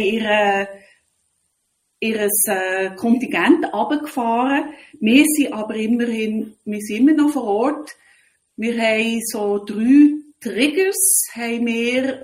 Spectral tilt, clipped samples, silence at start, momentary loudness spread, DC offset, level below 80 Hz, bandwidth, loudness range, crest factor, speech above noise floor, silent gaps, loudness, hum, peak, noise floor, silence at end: -3 dB/octave; under 0.1%; 0 s; 12 LU; under 0.1%; -64 dBFS; 16 kHz; 3 LU; 18 dB; 52 dB; none; -18 LUFS; none; 0 dBFS; -70 dBFS; 0 s